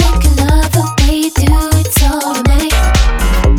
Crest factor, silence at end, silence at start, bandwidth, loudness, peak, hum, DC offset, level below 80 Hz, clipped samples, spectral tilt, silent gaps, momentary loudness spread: 10 dB; 0 s; 0 s; 18 kHz; -12 LUFS; 0 dBFS; none; under 0.1%; -12 dBFS; under 0.1%; -5 dB/octave; none; 2 LU